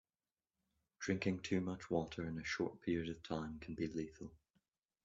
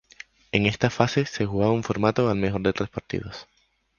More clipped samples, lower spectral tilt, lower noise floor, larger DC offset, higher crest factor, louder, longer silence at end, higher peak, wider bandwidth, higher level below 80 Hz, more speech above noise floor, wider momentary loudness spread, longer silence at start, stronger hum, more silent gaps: neither; about the same, -6 dB/octave vs -6 dB/octave; first, under -90 dBFS vs -49 dBFS; neither; about the same, 20 dB vs 24 dB; second, -42 LUFS vs -24 LUFS; first, 0.7 s vs 0.55 s; second, -22 dBFS vs -2 dBFS; about the same, 7.8 kHz vs 7.2 kHz; second, -68 dBFS vs -48 dBFS; first, over 48 dB vs 25 dB; about the same, 9 LU vs 11 LU; first, 1 s vs 0.55 s; neither; neither